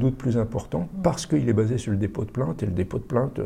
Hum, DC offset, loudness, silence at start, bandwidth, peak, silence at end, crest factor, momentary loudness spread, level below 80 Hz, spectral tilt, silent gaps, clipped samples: none; under 0.1%; -25 LUFS; 0 s; 13 kHz; -8 dBFS; 0 s; 16 dB; 6 LU; -44 dBFS; -7.5 dB/octave; none; under 0.1%